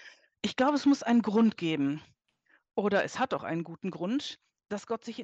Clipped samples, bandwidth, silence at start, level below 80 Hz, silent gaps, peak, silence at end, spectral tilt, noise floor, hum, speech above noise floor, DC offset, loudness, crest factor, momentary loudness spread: under 0.1%; 8.2 kHz; 0 s; -74 dBFS; none; -14 dBFS; 0 s; -5.5 dB/octave; -69 dBFS; none; 41 dB; under 0.1%; -30 LUFS; 16 dB; 14 LU